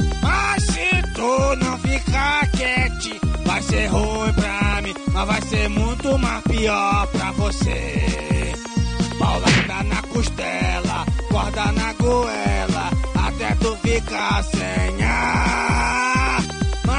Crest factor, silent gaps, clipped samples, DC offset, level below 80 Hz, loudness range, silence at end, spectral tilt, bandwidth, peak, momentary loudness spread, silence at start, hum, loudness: 14 dB; none; under 0.1%; under 0.1%; -26 dBFS; 1 LU; 0 s; -5 dB/octave; 10 kHz; -4 dBFS; 5 LU; 0 s; none; -20 LUFS